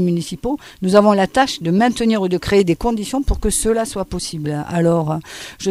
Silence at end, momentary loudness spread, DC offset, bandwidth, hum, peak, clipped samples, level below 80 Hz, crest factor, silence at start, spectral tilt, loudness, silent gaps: 0 s; 10 LU; under 0.1%; 15.5 kHz; none; 0 dBFS; under 0.1%; -32 dBFS; 18 dB; 0 s; -5 dB/octave; -18 LUFS; none